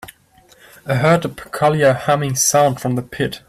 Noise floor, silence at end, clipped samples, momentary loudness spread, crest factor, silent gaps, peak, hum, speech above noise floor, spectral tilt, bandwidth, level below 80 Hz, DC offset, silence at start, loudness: -51 dBFS; 0.1 s; under 0.1%; 9 LU; 14 dB; none; -4 dBFS; none; 34 dB; -4.5 dB/octave; 15.5 kHz; -50 dBFS; under 0.1%; 0.05 s; -16 LUFS